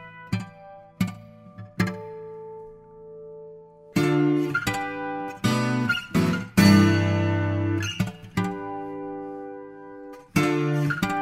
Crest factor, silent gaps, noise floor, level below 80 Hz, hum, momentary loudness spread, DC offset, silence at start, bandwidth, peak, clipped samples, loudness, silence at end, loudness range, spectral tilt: 20 dB; none; -46 dBFS; -54 dBFS; none; 22 LU; under 0.1%; 0 s; 16 kHz; -4 dBFS; under 0.1%; -24 LUFS; 0 s; 11 LU; -6 dB/octave